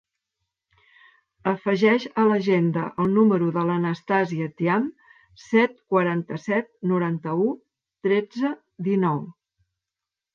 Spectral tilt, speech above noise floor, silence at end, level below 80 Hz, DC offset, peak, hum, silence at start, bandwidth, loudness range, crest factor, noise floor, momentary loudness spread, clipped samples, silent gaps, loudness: -8 dB/octave; 65 dB; 1.05 s; -68 dBFS; under 0.1%; -6 dBFS; none; 1.45 s; 7.2 kHz; 4 LU; 18 dB; -88 dBFS; 9 LU; under 0.1%; none; -23 LUFS